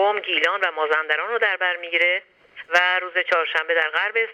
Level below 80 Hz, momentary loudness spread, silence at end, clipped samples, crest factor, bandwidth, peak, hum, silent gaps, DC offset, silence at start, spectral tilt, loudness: -80 dBFS; 3 LU; 0 s; under 0.1%; 18 dB; 13 kHz; -4 dBFS; none; none; under 0.1%; 0 s; -0.5 dB/octave; -20 LUFS